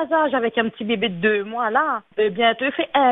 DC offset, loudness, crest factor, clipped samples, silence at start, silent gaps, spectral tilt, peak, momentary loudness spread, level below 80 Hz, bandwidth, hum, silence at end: under 0.1%; -20 LUFS; 16 dB; under 0.1%; 0 s; none; -8 dB/octave; -4 dBFS; 4 LU; -62 dBFS; 4 kHz; none; 0 s